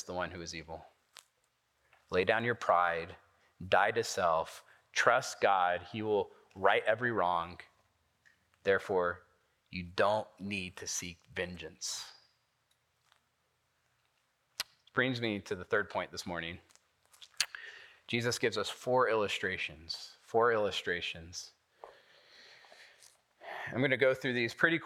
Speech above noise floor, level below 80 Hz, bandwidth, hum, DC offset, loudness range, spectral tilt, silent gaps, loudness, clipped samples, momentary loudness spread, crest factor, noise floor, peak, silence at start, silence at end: 45 dB; -74 dBFS; 16.5 kHz; none; under 0.1%; 10 LU; -3.5 dB/octave; none; -33 LUFS; under 0.1%; 16 LU; 24 dB; -78 dBFS; -12 dBFS; 0 s; 0 s